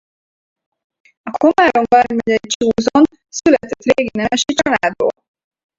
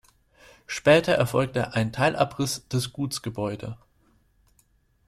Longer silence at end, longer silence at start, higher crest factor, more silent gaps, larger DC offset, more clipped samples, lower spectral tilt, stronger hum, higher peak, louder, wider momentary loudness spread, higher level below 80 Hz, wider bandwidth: second, 0.65 s vs 1.3 s; first, 1.25 s vs 0.7 s; about the same, 16 dB vs 20 dB; first, 2.55-2.60 s vs none; neither; neither; second, -3.5 dB/octave vs -5 dB/octave; neither; first, 0 dBFS vs -6 dBFS; first, -15 LUFS vs -25 LUFS; second, 6 LU vs 14 LU; first, -50 dBFS vs -56 dBFS; second, 8 kHz vs 15.5 kHz